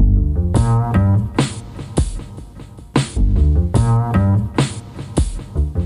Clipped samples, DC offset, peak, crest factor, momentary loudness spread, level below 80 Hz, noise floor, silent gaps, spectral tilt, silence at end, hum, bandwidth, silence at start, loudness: under 0.1%; under 0.1%; -4 dBFS; 12 dB; 15 LU; -20 dBFS; -36 dBFS; none; -7 dB/octave; 0 s; none; 11.5 kHz; 0 s; -18 LUFS